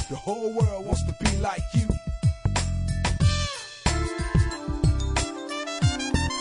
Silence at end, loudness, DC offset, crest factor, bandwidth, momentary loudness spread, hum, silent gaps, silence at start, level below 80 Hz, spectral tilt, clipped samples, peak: 0 s; -26 LUFS; under 0.1%; 18 dB; 10.5 kHz; 5 LU; none; none; 0 s; -32 dBFS; -5 dB/octave; under 0.1%; -6 dBFS